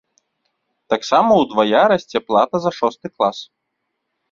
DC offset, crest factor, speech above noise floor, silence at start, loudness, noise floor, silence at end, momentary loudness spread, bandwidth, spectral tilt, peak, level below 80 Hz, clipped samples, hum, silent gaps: under 0.1%; 18 dB; 59 dB; 0.9 s; -17 LUFS; -75 dBFS; 0.85 s; 9 LU; 7.6 kHz; -5 dB/octave; -2 dBFS; -60 dBFS; under 0.1%; none; none